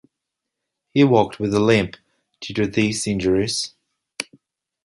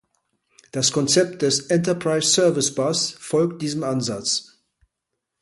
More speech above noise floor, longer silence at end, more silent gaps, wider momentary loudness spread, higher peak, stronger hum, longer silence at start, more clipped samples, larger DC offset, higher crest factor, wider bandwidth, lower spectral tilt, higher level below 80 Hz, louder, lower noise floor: about the same, 63 dB vs 60 dB; second, 0.6 s vs 1 s; neither; first, 16 LU vs 7 LU; first, -2 dBFS vs -6 dBFS; neither; first, 0.95 s vs 0.75 s; neither; neither; about the same, 20 dB vs 18 dB; about the same, 11.5 kHz vs 11.5 kHz; first, -5 dB/octave vs -3.5 dB/octave; first, -50 dBFS vs -64 dBFS; about the same, -20 LUFS vs -21 LUFS; about the same, -82 dBFS vs -81 dBFS